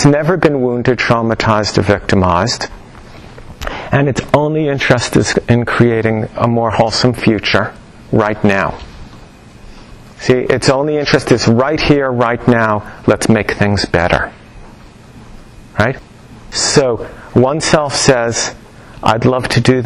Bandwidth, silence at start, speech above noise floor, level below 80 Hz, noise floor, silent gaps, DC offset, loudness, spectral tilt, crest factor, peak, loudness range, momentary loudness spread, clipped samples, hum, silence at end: 12.5 kHz; 0 s; 25 dB; -34 dBFS; -37 dBFS; none; under 0.1%; -13 LUFS; -5 dB/octave; 14 dB; 0 dBFS; 4 LU; 7 LU; under 0.1%; none; 0 s